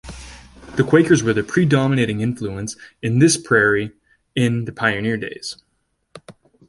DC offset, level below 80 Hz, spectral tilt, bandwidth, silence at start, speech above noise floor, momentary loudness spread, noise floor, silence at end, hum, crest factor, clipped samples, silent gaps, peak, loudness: under 0.1%; -48 dBFS; -5.5 dB/octave; 11.5 kHz; 0.05 s; 51 dB; 16 LU; -69 dBFS; 0.35 s; none; 18 dB; under 0.1%; none; -2 dBFS; -18 LUFS